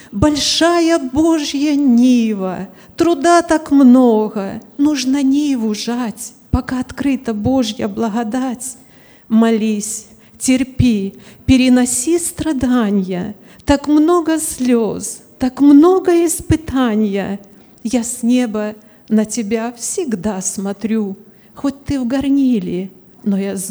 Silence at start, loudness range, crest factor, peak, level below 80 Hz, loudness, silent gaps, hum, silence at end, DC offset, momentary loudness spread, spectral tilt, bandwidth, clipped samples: 0.1 s; 6 LU; 14 dB; 0 dBFS; -38 dBFS; -15 LUFS; none; none; 0 s; under 0.1%; 13 LU; -4.5 dB/octave; over 20 kHz; under 0.1%